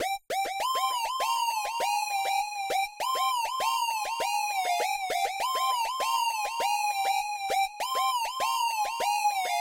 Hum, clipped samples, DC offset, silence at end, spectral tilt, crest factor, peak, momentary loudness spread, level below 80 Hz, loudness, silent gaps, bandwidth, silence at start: none; under 0.1%; under 0.1%; 0 s; 1.5 dB/octave; 12 dB; -18 dBFS; 2 LU; -68 dBFS; -28 LUFS; none; 16 kHz; 0 s